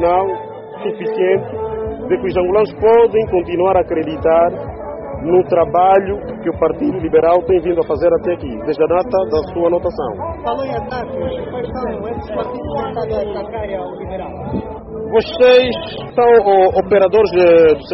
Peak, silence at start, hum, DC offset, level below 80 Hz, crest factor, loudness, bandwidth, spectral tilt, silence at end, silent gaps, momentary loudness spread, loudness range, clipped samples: -2 dBFS; 0 s; none; under 0.1%; -38 dBFS; 14 dB; -15 LUFS; 5.8 kHz; -5 dB/octave; 0 s; none; 13 LU; 9 LU; under 0.1%